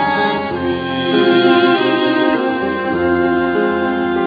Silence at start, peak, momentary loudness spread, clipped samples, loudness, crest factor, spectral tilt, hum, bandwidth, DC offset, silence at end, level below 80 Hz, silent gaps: 0 s; 0 dBFS; 7 LU; under 0.1%; -15 LUFS; 14 dB; -8 dB/octave; none; 5 kHz; under 0.1%; 0 s; -48 dBFS; none